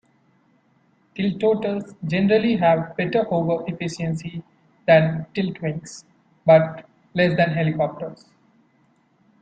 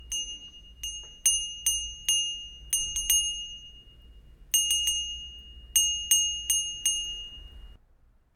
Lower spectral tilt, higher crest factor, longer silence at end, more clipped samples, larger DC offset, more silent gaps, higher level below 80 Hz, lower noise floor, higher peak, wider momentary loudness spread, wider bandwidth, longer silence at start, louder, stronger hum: first, -7 dB/octave vs 3 dB/octave; about the same, 20 dB vs 22 dB; first, 1.25 s vs 0.65 s; neither; neither; neither; second, -60 dBFS vs -50 dBFS; about the same, -61 dBFS vs -61 dBFS; first, -2 dBFS vs -8 dBFS; about the same, 18 LU vs 17 LU; second, 9 kHz vs 17.5 kHz; first, 1.15 s vs 0 s; first, -21 LUFS vs -26 LUFS; neither